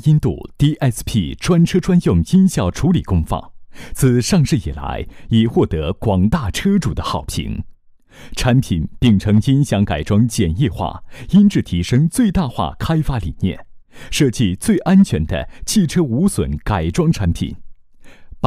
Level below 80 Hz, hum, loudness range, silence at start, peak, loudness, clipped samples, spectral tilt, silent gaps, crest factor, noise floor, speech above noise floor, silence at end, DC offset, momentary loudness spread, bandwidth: -30 dBFS; none; 3 LU; 0.05 s; -2 dBFS; -17 LUFS; under 0.1%; -6.5 dB/octave; none; 14 dB; -40 dBFS; 24 dB; 0 s; under 0.1%; 11 LU; 15.5 kHz